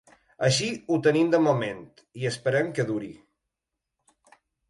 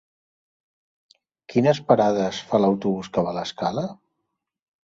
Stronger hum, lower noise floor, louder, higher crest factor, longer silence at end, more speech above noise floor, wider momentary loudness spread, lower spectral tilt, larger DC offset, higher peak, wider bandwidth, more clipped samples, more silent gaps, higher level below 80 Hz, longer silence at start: neither; first, -85 dBFS vs -79 dBFS; second, -25 LUFS vs -22 LUFS; about the same, 20 dB vs 22 dB; first, 1.55 s vs 0.95 s; about the same, 60 dB vs 58 dB; first, 13 LU vs 8 LU; second, -5 dB/octave vs -6.5 dB/octave; neither; second, -8 dBFS vs -2 dBFS; first, 11.5 kHz vs 7.8 kHz; neither; neither; about the same, -66 dBFS vs -62 dBFS; second, 0.4 s vs 1.5 s